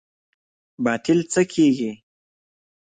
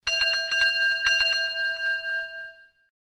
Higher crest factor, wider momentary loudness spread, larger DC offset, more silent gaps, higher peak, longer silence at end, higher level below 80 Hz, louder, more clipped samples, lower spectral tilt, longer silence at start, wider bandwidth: about the same, 18 dB vs 16 dB; second, 8 LU vs 13 LU; neither; neither; first, -6 dBFS vs -10 dBFS; first, 1 s vs 0.55 s; about the same, -62 dBFS vs -58 dBFS; about the same, -21 LUFS vs -23 LUFS; neither; first, -5 dB/octave vs 2 dB/octave; first, 0.8 s vs 0.05 s; second, 9.6 kHz vs 13.5 kHz